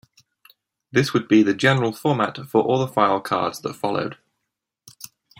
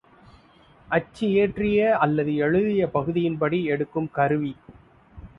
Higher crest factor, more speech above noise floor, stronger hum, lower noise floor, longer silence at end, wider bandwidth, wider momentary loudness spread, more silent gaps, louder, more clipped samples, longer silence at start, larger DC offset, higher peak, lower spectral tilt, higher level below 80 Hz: about the same, 20 dB vs 18 dB; first, 61 dB vs 32 dB; neither; first, -81 dBFS vs -54 dBFS; first, 1.25 s vs 0.1 s; first, 16.5 kHz vs 7.2 kHz; first, 11 LU vs 6 LU; neither; about the same, -21 LUFS vs -23 LUFS; neither; about the same, 0.95 s vs 0.9 s; neither; about the same, -4 dBFS vs -6 dBFS; second, -6 dB/octave vs -8.5 dB/octave; second, -64 dBFS vs -52 dBFS